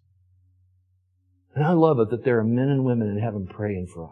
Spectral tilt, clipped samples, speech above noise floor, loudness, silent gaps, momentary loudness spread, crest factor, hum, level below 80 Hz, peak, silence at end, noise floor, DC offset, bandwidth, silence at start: -10 dB/octave; under 0.1%; 44 dB; -23 LUFS; none; 11 LU; 20 dB; none; -52 dBFS; -4 dBFS; 0.05 s; -66 dBFS; under 0.1%; 9.8 kHz; 1.55 s